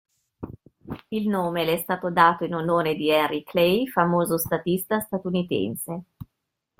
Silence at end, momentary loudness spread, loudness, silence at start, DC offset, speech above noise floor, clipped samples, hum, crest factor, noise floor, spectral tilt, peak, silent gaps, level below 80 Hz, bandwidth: 0.55 s; 18 LU; -23 LUFS; 0.4 s; under 0.1%; 57 dB; under 0.1%; none; 22 dB; -81 dBFS; -5.5 dB/octave; -2 dBFS; none; -58 dBFS; 16.5 kHz